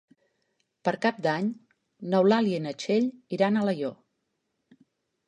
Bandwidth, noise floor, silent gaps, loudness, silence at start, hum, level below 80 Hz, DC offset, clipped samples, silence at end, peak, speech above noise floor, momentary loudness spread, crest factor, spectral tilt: 10 kHz; -79 dBFS; none; -27 LUFS; 0.85 s; none; -76 dBFS; under 0.1%; under 0.1%; 1.35 s; -10 dBFS; 53 dB; 10 LU; 18 dB; -6.5 dB/octave